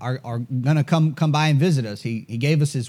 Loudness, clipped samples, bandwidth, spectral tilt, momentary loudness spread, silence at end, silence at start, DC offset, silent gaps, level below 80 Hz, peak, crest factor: -21 LUFS; under 0.1%; 12.5 kHz; -6.5 dB/octave; 10 LU; 0 s; 0 s; under 0.1%; none; -68 dBFS; -8 dBFS; 14 dB